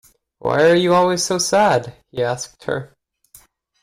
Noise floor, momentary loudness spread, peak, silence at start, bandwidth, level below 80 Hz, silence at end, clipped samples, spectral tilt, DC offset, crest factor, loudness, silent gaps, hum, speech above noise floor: -51 dBFS; 13 LU; -6 dBFS; 0.45 s; 16 kHz; -56 dBFS; 0.95 s; under 0.1%; -4 dB/octave; under 0.1%; 14 dB; -18 LUFS; none; none; 33 dB